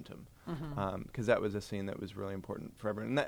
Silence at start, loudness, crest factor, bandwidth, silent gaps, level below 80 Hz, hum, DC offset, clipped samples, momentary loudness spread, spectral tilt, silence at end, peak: 0 s; -38 LUFS; 22 dB; over 20 kHz; none; -58 dBFS; none; under 0.1%; under 0.1%; 12 LU; -6.5 dB/octave; 0 s; -16 dBFS